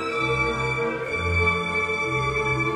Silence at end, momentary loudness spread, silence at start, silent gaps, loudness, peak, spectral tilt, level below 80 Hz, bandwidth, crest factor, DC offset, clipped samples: 0 s; 4 LU; 0 s; none; -23 LUFS; -10 dBFS; -5 dB/octave; -42 dBFS; 12 kHz; 14 dB; under 0.1%; under 0.1%